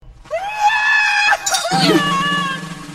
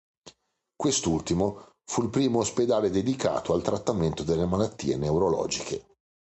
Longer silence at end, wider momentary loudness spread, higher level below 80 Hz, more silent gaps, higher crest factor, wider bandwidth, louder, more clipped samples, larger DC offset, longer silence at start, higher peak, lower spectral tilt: second, 0 s vs 0.5 s; first, 12 LU vs 6 LU; about the same, -48 dBFS vs -48 dBFS; neither; about the same, 16 dB vs 16 dB; first, 16 kHz vs 9 kHz; first, -15 LUFS vs -27 LUFS; neither; neither; second, 0.05 s vs 0.25 s; first, 0 dBFS vs -10 dBFS; second, -2.5 dB/octave vs -5 dB/octave